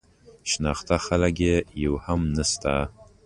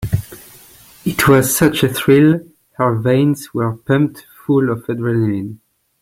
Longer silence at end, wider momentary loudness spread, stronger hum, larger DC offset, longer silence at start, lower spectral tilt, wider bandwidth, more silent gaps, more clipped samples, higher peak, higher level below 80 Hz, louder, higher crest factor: second, 0.25 s vs 0.45 s; second, 6 LU vs 12 LU; neither; neither; first, 0.45 s vs 0 s; about the same, -4.5 dB/octave vs -5.5 dB/octave; second, 11.5 kHz vs 16.5 kHz; neither; neither; second, -6 dBFS vs 0 dBFS; first, -36 dBFS vs -44 dBFS; second, -25 LUFS vs -16 LUFS; about the same, 18 dB vs 16 dB